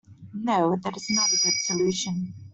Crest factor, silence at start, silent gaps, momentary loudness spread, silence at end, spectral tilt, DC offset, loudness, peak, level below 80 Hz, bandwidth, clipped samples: 16 dB; 0.1 s; none; 12 LU; 0 s; -2.5 dB/octave; under 0.1%; -24 LUFS; -10 dBFS; -64 dBFS; 8.4 kHz; under 0.1%